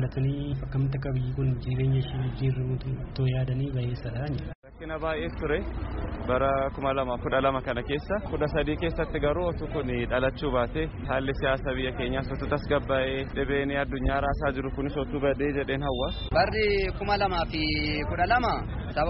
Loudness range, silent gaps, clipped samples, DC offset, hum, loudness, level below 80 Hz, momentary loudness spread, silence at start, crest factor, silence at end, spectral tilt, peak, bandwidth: 4 LU; 4.55-4.62 s; under 0.1%; under 0.1%; none; -28 LUFS; -38 dBFS; 6 LU; 0 s; 16 dB; 0 s; -5 dB/octave; -10 dBFS; 5.8 kHz